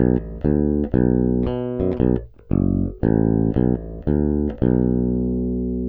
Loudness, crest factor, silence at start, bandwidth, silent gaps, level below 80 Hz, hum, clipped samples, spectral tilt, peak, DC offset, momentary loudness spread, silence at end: -21 LUFS; 16 dB; 0 s; 3.6 kHz; none; -30 dBFS; 60 Hz at -45 dBFS; under 0.1%; -13 dB/octave; -4 dBFS; under 0.1%; 5 LU; 0 s